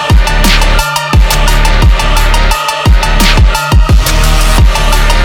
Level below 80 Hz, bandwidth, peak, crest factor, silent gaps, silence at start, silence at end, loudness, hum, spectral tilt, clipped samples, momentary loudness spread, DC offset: -8 dBFS; 17.5 kHz; 0 dBFS; 6 dB; none; 0 s; 0 s; -9 LUFS; none; -4 dB/octave; 0.9%; 2 LU; under 0.1%